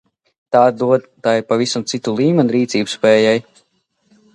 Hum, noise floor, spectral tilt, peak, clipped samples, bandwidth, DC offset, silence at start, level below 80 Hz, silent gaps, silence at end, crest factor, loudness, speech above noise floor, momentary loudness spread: none; -64 dBFS; -5 dB/octave; 0 dBFS; under 0.1%; 11 kHz; under 0.1%; 0.5 s; -62 dBFS; none; 0.95 s; 16 dB; -16 LUFS; 49 dB; 6 LU